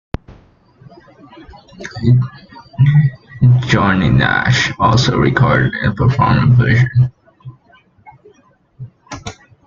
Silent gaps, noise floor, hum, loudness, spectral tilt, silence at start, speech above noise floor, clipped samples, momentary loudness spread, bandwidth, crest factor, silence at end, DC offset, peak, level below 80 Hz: none; -52 dBFS; none; -13 LUFS; -6.5 dB/octave; 0.3 s; 40 dB; under 0.1%; 19 LU; 7.4 kHz; 14 dB; 0.35 s; under 0.1%; 0 dBFS; -36 dBFS